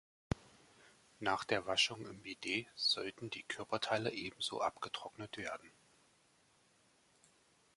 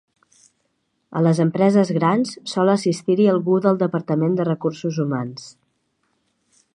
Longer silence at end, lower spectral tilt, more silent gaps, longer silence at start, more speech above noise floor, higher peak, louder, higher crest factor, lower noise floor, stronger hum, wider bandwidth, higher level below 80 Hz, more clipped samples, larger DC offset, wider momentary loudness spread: first, 2.05 s vs 1.25 s; second, -3 dB/octave vs -7 dB/octave; neither; second, 0.3 s vs 1.1 s; second, 32 dB vs 52 dB; second, -18 dBFS vs -2 dBFS; second, -39 LUFS vs -19 LUFS; first, 24 dB vs 18 dB; about the same, -72 dBFS vs -70 dBFS; neither; about the same, 11.5 kHz vs 11 kHz; first, -64 dBFS vs -70 dBFS; neither; neither; first, 12 LU vs 8 LU